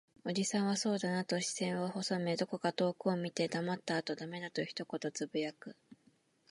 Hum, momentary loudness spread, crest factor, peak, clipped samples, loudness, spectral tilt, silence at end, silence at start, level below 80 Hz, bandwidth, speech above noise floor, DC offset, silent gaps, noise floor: none; 7 LU; 18 dB; -18 dBFS; under 0.1%; -36 LUFS; -4.5 dB/octave; 0.55 s; 0.25 s; -84 dBFS; 11.5 kHz; 35 dB; under 0.1%; none; -71 dBFS